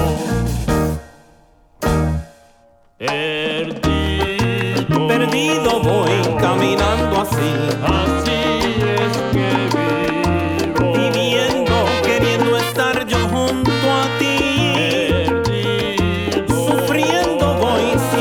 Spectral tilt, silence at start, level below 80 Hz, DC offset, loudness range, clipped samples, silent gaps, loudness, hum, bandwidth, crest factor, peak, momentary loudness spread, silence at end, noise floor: -5 dB/octave; 0 s; -32 dBFS; under 0.1%; 4 LU; under 0.1%; none; -17 LUFS; none; over 20 kHz; 14 dB; -2 dBFS; 4 LU; 0 s; -51 dBFS